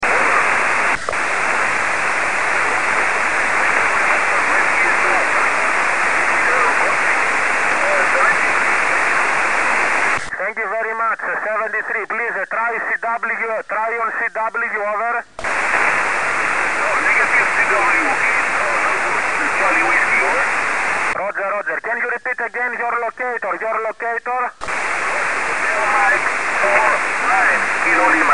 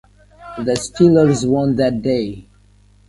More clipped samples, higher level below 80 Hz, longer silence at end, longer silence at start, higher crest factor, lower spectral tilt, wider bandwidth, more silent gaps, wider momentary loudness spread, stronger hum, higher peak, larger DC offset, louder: neither; second, -52 dBFS vs -44 dBFS; second, 0 s vs 0.7 s; second, 0 s vs 0.4 s; about the same, 18 dB vs 18 dB; second, -2 dB/octave vs -6.5 dB/octave; about the same, 11 kHz vs 11.5 kHz; neither; second, 7 LU vs 16 LU; second, none vs 50 Hz at -40 dBFS; about the same, 0 dBFS vs 0 dBFS; first, 3% vs under 0.1%; about the same, -16 LUFS vs -16 LUFS